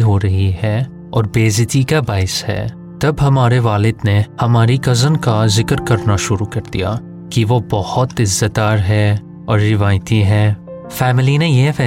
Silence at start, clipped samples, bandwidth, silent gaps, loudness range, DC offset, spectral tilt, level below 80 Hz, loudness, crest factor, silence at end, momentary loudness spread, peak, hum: 0 s; under 0.1%; 15.5 kHz; none; 2 LU; under 0.1%; -5.5 dB/octave; -38 dBFS; -15 LUFS; 12 dB; 0 s; 7 LU; -2 dBFS; none